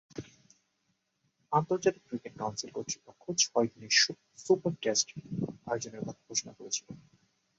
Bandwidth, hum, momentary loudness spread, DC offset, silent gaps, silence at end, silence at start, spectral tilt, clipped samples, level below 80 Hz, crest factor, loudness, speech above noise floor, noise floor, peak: 8 kHz; none; 15 LU; under 0.1%; none; 0.6 s; 0.15 s; -2.5 dB/octave; under 0.1%; -70 dBFS; 24 dB; -31 LUFS; 46 dB; -78 dBFS; -10 dBFS